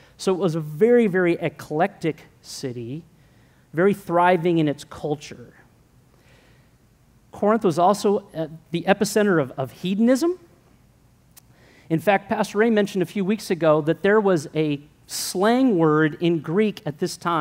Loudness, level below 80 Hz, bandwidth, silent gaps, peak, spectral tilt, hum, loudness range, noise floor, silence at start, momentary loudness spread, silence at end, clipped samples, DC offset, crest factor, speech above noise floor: -22 LUFS; -62 dBFS; 16 kHz; none; -4 dBFS; -6 dB/octave; none; 4 LU; -56 dBFS; 0.2 s; 13 LU; 0 s; under 0.1%; under 0.1%; 18 dB; 35 dB